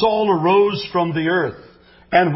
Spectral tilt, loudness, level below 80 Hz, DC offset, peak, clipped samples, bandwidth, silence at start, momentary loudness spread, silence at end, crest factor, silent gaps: -10 dB/octave; -18 LUFS; -52 dBFS; under 0.1%; -2 dBFS; under 0.1%; 5.8 kHz; 0 s; 6 LU; 0 s; 16 dB; none